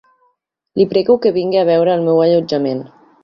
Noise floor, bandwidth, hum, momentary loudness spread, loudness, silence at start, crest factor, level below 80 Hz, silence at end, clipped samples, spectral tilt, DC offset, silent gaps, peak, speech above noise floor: -64 dBFS; 6.4 kHz; none; 8 LU; -14 LUFS; 0.75 s; 14 dB; -58 dBFS; 0.35 s; under 0.1%; -8 dB/octave; under 0.1%; none; -2 dBFS; 51 dB